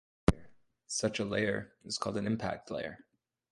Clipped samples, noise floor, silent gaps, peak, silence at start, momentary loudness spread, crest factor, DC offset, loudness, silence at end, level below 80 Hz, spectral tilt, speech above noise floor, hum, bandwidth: under 0.1%; -58 dBFS; none; -8 dBFS; 0.3 s; 9 LU; 28 dB; under 0.1%; -35 LUFS; 0.55 s; -48 dBFS; -4.5 dB/octave; 23 dB; none; 11.5 kHz